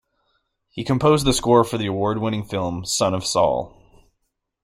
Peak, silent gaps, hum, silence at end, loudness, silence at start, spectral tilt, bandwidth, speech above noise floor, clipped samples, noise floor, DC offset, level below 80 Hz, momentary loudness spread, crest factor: -2 dBFS; none; none; 0.95 s; -20 LUFS; 0.75 s; -5 dB/octave; 15.5 kHz; 55 dB; under 0.1%; -75 dBFS; under 0.1%; -44 dBFS; 10 LU; 20 dB